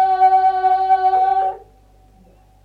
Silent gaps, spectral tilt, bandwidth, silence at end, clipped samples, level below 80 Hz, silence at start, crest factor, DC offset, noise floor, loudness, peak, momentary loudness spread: none; -5 dB/octave; 4.8 kHz; 1.05 s; under 0.1%; -52 dBFS; 0 s; 12 dB; under 0.1%; -50 dBFS; -16 LUFS; -4 dBFS; 9 LU